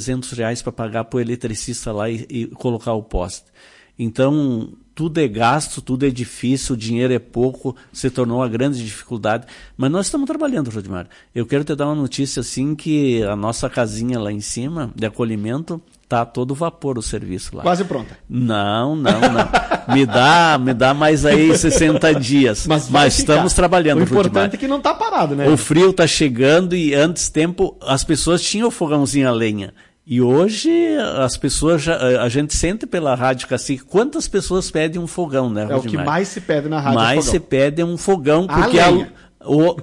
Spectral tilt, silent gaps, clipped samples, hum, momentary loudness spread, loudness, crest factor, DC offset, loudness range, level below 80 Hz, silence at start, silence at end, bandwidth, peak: -5 dB/octave; none; under 0.1%; none; 11 LU; -17 LUFS; 12 dB; under 0.1%; 9 LU; -36 dBFS; 0 s; 0 s; 11.5 kHz; -4 dBFS